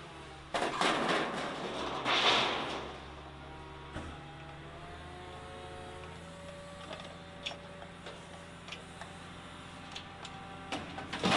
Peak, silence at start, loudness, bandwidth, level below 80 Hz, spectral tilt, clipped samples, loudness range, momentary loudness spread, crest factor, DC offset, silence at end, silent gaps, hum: -14 dBFS; 0 s; -36 LUFS; 11.5 kHz; -60 dBFS; -3.5 dB/octave; under 0.1%; 14 LU; 18 LU; 24 dB; under 0.1%; 0 s; none; none